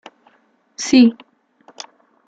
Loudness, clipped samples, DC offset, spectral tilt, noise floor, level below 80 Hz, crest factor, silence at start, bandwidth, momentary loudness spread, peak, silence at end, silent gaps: -15 LUFS; under 0.1%; under 0.1%; -3.5 dB/octave; -59 dBFS; -62 dBFS; 18 dB; 0.8 s; 8 kHz; 25 LU; -2 dBFS; 1.15 s; none